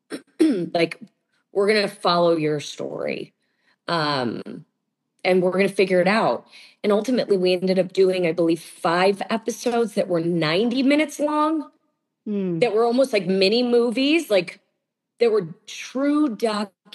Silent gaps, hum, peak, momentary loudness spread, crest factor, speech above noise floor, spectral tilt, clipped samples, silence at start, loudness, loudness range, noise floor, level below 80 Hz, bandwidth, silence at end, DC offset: none; none; -6 dBFS; 11 LU; 16 dB; 57 dB; -5.5 dB/octave; under 0.1%; 0.1 s; -21 LUFS; 3 LU; -78 dBFS; -82 dBFS; 12.5 kHz; 0.3 s; under 0.1%